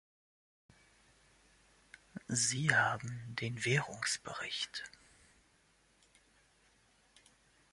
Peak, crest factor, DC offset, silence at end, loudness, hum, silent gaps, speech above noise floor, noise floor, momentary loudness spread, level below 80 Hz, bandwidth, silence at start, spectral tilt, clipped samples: -12 dBFS; 28 dB; under 0.1%; 2.85 s; -35 LUFS; none; none; 35 dB; -71 dBFS; 16 LU; -72 dBFS; 11.5 kHz; 2.15 s; -2.5 dB/octave; under 0.1%